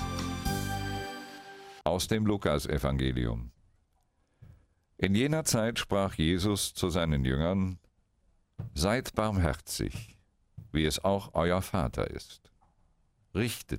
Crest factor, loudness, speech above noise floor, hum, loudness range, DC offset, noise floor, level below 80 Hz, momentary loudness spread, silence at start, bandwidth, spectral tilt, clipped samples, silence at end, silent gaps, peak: 22 dB; -31 LUFS; 42 dB; none; 4 LU; under 0.1%; -72 dBFS; -44 dBFS; 12 LU; 0 s; 16 kHz; -5 dB/octave; under 0.1%; 0 s; none; -10 dBFS